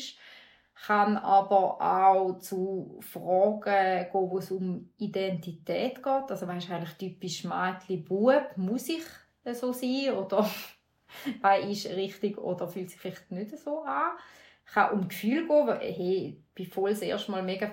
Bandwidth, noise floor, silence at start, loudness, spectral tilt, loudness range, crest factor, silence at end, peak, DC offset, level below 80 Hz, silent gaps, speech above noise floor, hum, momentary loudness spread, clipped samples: 16 kHz; -55 dBFS; 0 s; -29 LUFS; -5.5 dB/octave; 6 LU; 18 dB; 0 s; -10 dBFS; under 0.1%; -74 dBFS; none; 27 dB; none; 15 LU; under 0.1%